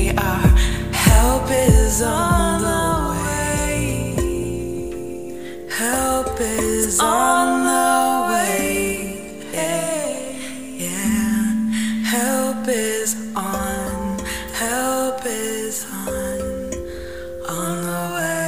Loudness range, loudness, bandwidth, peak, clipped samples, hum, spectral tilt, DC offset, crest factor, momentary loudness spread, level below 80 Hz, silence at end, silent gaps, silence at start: 6 LU; -20 LUFS; 16 kHz; -2 dBFS; under 0.1%; none; -4.5 dB/octave; 0.8%; 18 dB; 12 LU; -26 dBFS; 0 s; none; 0 s